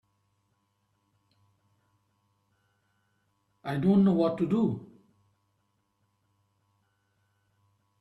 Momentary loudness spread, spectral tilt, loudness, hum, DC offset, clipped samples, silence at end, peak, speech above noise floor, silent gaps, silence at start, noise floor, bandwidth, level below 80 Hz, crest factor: 16 LU; -9.5 dB/octave; -26 LUFS; none; under 0.1%; under 0.1%; 3.15 s; -14 dBFS; 51 dB; none; 3.65 s; -75 dBFS; 4.5 kHz; -68 dBFS; 20 dB